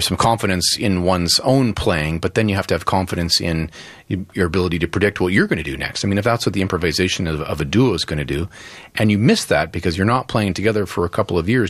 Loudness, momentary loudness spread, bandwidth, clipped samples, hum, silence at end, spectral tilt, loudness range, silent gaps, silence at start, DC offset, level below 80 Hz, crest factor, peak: -18 LUFS; 8 LU; 14.5 kHz; under 0.1%; none; 0 s; -5 dB/octave; 2 LU; none; 0 s; under 0.1%; -38 dBFS; 16 dB; -2 dBFS